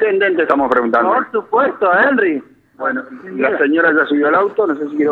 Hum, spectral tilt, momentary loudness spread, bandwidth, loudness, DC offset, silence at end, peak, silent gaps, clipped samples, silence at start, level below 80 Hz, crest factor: none; -7 dB/octave; 9 LU; 4.7 kHz; -15 LUFS; under 0.1%; 0 s; -2 dBFS; none; under 0.1%; 0 s; -60 dBFS; 14 dB